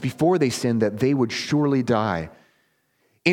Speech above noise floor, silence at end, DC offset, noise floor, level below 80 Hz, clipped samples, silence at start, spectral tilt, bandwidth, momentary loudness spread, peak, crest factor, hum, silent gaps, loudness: 46 dB; 0 s; under 0.1%; -67 dBFS; -56 dBFS; under 0.1%; 0 s; -6 dB/octave; 16.5 kHz; 6 LU; -2 dBFS; 20 dB; none; none; -22 LUFS